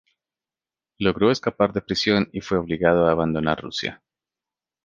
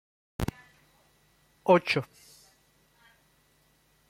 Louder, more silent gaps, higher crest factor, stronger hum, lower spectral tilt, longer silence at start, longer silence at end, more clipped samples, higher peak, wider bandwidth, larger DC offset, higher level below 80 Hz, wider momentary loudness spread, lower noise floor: first, -22 LUFS vs -28 LUFS; neither; about the same, 22 dB vs 24 dB; neither; about the same, -6 dB/octave vs -6 dB/octave; first, 1 s vs 0.4 s; second, 0.9 s vs 2.05 s; neither; first, -2 dBFS vs -8 dBFS; second, 7.6 kHz vs 16.5 kHz; neither; about the same, -48 dBFS vs -52 dBFS; second, 7 LU vs 20 LU; first, under -90 dBFS vs -67 dBFS